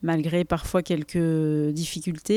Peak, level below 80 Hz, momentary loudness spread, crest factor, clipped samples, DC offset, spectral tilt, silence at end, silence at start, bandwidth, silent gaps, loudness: -10 dBFS; -46 dBFS; 5 LU; 14 dB; under 0.1%; under 0.1%; -6 dB/octave; 0 s; 0 s; 16 kHz; none; -25 LUFS